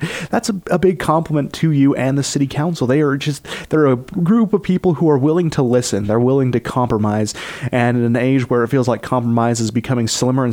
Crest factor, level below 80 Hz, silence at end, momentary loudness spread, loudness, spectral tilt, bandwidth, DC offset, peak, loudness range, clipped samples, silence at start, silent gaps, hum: 14 dB; -46 dBFS; 0 s; 5 LU; -17 LUFS; -6 dB/octave; 16.5 kHz; under 0.1%; -2 dBFS; 1 LU; under 0.1%; 0 s; none; none